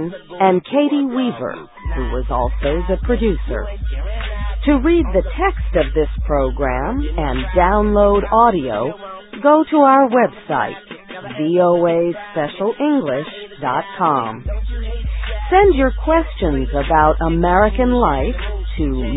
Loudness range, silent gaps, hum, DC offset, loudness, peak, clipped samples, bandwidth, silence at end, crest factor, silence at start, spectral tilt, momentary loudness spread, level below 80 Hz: 5 LU; none; none; under 0.1%; -17 LUFS; 0 dBFS; under 0.1%; 4 kHz; 0 s; 16 dB; 0 s; -12 dB/octave; 12 LU; -24 dBFS